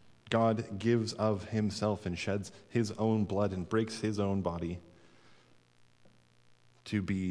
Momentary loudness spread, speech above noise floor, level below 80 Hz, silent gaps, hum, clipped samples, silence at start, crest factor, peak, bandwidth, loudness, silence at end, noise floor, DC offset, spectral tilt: 7 LU; 31 dB; -62 dBFS; none; none; under 0.1%; 0.05 s; 20 dB; -14 dBFS; 11 kHz; -33 LUFS; 0 s; -63 dBFS; under 0.1%; -6.5 dB/octave